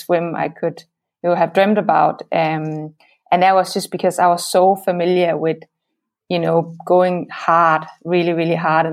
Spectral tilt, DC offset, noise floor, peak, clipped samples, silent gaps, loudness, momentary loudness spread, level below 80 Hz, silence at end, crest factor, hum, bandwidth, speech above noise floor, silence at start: -5.5 dB/octave; under 0.1%; -77 dBFS; -2 dBFS; under 0.1%; none; -17 LUFS; 9 LU; -70 dBFS; 0 s; 16 dB; none; 16 kHz; 60 dB; 0 s